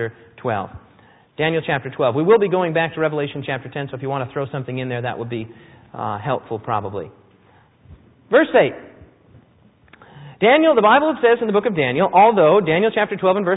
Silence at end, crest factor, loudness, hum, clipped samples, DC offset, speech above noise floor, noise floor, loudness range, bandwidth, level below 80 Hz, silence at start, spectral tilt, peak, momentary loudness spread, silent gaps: 0 s; 18 dB; -18 LUFS; none; under 0.1%; under 0.1%; 35 dB; -53 dBFS; 11 LU; 4 kHz; -56 dBFS; 0 s; -11 dB/octave; -2 dBFS; 16 LU; none